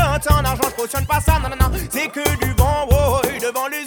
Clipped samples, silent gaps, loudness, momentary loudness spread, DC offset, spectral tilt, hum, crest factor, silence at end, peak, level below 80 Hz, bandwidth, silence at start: under 0.1%; none; -18 LUFS; 6 LU; under 0.1%; -5 dB/octave; none; 18 dB; 0 s; 0 dBFS; -22 dBFS; over 20 kHz; 0 s